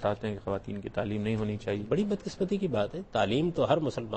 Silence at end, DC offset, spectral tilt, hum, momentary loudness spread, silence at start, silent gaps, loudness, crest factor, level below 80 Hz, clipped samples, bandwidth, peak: 0 s; under 0.1%; -7 dB/octave; none; 7 LU; 0 s; none; -31 LUFS; 18 dB; -54 dBFS; under 0.1%; 8.4 kHz; -12 dBFS